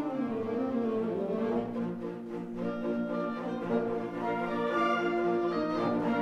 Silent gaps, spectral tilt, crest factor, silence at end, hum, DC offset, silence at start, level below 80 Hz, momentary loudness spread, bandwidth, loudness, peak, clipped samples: none; -7.5 dB/octave; 14 dB; 0 s; none; under 0.1%; 0 s; -66 dBFS; 7 LU; 8 kHz; -32 LUFS; -16 dBFS; under 0.1%